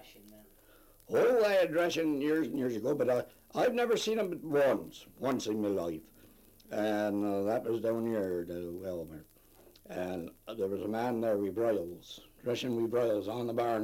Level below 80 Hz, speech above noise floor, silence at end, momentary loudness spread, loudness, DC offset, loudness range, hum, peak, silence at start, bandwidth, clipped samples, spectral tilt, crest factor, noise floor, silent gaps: -66 dBFS; 28 dB; 0 s; 12 LU; -32 LUFS; under 0.1%; 6 LU; none; -18 dBFS; 0 s; 16.5 kHz; under 0.1%; -5.5 dB/octave; 16 dB; -60 dBFS; none